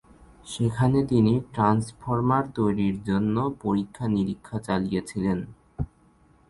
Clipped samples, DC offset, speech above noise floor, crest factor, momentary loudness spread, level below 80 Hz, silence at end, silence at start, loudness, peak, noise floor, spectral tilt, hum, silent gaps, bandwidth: under 0.1%; under 0.1%; 34 dB; 18 dB; 13 LU; -48 dBFS; 0.65 s; 0.45 s; -25 LUFS; -8 dBFS; -59 dBFS; -7.5 dB/octave; none; none; 11.5 kHz